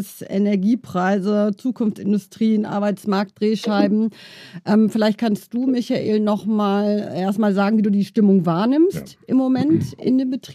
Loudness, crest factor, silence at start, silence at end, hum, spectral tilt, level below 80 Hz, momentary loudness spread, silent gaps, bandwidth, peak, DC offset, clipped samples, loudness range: -19 LUFS; 14 dB; 0 s; 0 s; none; -7.5 dB/octave; -64 dBFS; 6 LU; none; 14 kHz; -6 dBFS; under 0.1%; under 0.1%; 2 LU